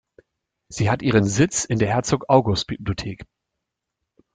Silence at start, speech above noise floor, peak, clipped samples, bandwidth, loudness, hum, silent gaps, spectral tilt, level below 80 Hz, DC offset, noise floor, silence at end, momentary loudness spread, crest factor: 0.7 s; 61 dB; -2 dBFS; under 0.1%; 9.6 kHz; -21 LUFS; none; none; -5 dB/octave; -48 dBFS; under 0.1%; -82 dBFS; 1.1 s; 13 LU; 20 dB